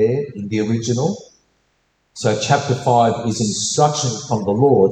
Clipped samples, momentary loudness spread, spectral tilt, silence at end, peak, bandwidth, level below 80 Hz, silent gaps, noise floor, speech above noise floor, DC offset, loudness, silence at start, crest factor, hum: under 0.1%; 8 LU; -5 dB/octave; 0 s; -2 dBFS; 9.4 kHz; -54 dBFS; none; -65 dBFS; 47 dB; under 0.1%; -18 LUFS; 0 s; 16 dB; none